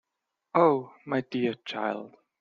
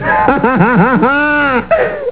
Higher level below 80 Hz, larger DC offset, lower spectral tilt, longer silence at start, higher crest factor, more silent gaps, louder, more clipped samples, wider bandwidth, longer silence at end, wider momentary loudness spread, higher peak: second, -74 dBFS vs -36 dBFS; second, under 0.1% vs 1%; second, -7.5 dB/octave vs -10.5 dB/octave; first, 0.55 s vs 0 s; first, 20 dB vs 10 dB; neither; second, -28 LUFS vs -10 LUFS; neither; first, 7.2 kHz vs 4 kHz; first, 0.35 s vs 0 s; first, 10 LU vs 3 LU; second, -8 dBFS vs 0 dBFS